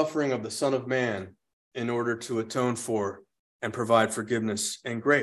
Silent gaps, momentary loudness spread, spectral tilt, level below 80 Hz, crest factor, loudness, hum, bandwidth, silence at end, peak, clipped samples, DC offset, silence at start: 1.53-1.71 s, 3.39-3.59 s; 12 LU; -4.5 dB/octave; -66 dBFS; 20 dB; -28 LUFS; none; 13 kHz; 0 s; -8 dBFS; under 0.1%; under 0.1%; 0 s